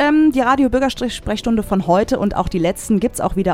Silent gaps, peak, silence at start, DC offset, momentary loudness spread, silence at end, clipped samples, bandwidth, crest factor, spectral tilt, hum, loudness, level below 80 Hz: none; -2 dBFS; 0 s; under 0.1%; 6 LU; 0 s; under 0.1%; 16 kHz; 14 dB; -5.5 dB/octave; none; -17 LUFS; -34 dBFS